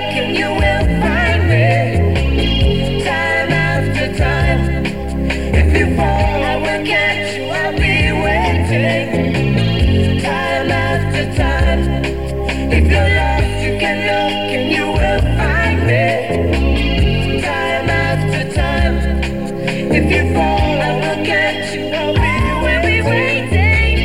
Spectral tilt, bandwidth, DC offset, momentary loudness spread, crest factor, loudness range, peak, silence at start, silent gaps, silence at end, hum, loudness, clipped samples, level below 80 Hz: -6 dB/octave; 13.5 kHz; 2%; 5 LU; 14 dB; 1 LU; 0 dBFS; 0 s; none; 0 s; none; -15 LUFS; under 0.1%; -20 dBFS